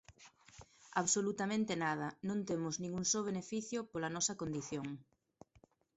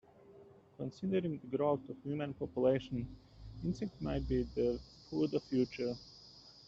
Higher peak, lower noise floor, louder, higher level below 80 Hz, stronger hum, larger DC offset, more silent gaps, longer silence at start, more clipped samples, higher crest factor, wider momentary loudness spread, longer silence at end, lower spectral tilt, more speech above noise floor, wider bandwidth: about the same, -20 dBFS vs -20 dBFS; first, -70 dBFS vs -60 dBFS; about the same, -38 LUFS vs -37 LUFS; second, -72 dBFS vs -54 dBFS; neither; neither; neither; second, 0.1 s vs 0.3 s; neither; about the same, 20 dB vs 18 dB; second, 9 LU vs 14 LU; first, 0.95 s vs 0.05 s; second, -3.5 dB/octave vs -8 dB/octave; first, 32 dB vs 24 dB; about the same, 8.2 kHz vs 7.6 kHz